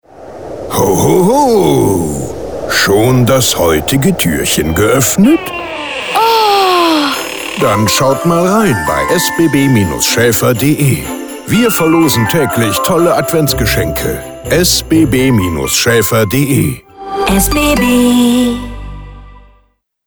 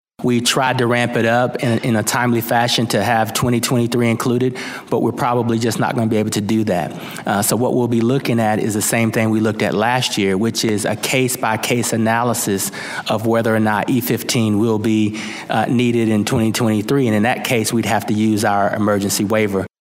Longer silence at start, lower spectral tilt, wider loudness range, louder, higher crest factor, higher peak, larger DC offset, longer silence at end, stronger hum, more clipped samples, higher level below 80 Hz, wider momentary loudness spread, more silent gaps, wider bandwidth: about the same, 0.15 s vs 0.2 s; about the same, -4.5 dB/octave vs -4.5 dB/octave; about the same, 1 LU vs 1 LU; first, -10 LUFS vs -17 LUFS; about the same, 12 dB vs 16 dB; about the same, 0 dBFS vs 0 dBFS; first, 0.4% vs under 0.1%; first, 0.7 s vs 0.15 s; neither; neither; first, -30 dBFS vs -56 dBFS; first, 10 LU vs 4 LU; neither; first, over 20 kHz vs 16 kHz